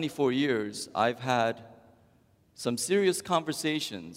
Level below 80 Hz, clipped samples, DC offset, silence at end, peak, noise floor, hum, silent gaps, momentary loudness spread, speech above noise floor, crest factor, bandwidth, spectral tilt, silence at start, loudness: -72 dBFS; under 0.1%; under 0.1%; 0 s; -12 dBFS; -64 dBFS; none; none; 7 LU; 35 dB; 18 dB; 16 kHz; -4 dB/octave; 0 s; -29 LUFS